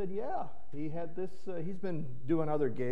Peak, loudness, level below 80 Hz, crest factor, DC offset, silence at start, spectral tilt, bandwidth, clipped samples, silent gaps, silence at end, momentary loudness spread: -18 dBFS; -37 LUFS; -66 dBFS; 16 dB; 3%; 0 s; -9.5 dB/octave; 8.6 kHz; under 0.1%; none; 0 s; 9 LU